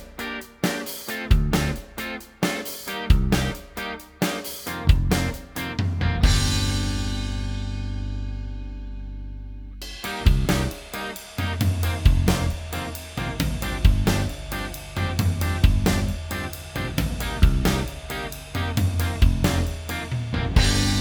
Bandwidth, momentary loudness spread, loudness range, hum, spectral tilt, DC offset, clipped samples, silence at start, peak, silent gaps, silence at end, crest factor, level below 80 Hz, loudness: over 20 kHz; 12 LU; 4 LU; none; -5 dB/octave; under 0.1%; under 0.1%; 0 s; -2 dBFS; none; 0 s; 20 dB; -26 dBFS; -25 LUFS